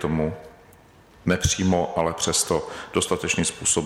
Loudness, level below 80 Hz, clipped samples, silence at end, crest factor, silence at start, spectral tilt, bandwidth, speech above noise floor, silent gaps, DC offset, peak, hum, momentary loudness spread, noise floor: -23 LUFS; -44 dBFS; under 0.1%; 0 s; 16 dB; 0 s; -3.5 dB/octave; 16.5 kHz; 28 dB; none; under 0.1%; -8 dBFS; none; 7 LU; -51 dBFS